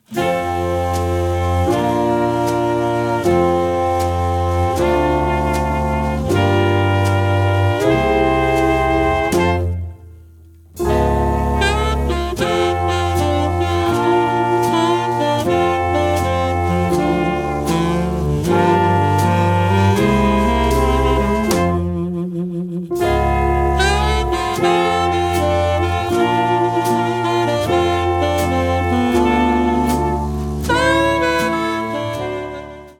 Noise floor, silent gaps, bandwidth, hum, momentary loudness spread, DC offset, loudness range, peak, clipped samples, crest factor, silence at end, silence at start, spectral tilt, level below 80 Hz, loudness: -43 dBFS; none; 17.5 kHz; none; 5 LU; under 0.1%; 2 LU; -2 dBFS; under 0.1%; 14 dB; 0.05 s; 0.1 s; -6 dB/octave; -28 dBFS; -17 LUFS